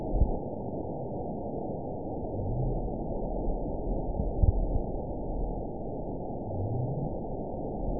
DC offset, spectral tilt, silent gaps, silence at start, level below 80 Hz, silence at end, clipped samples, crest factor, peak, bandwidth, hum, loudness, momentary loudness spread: 0.7%; -17 dB/octave; none; 0 s; -34 dBFS; 0 s; under 0.1%; 22 dB; -10 dBFS; 1 kHz; none; -34 LUFS; 6 LU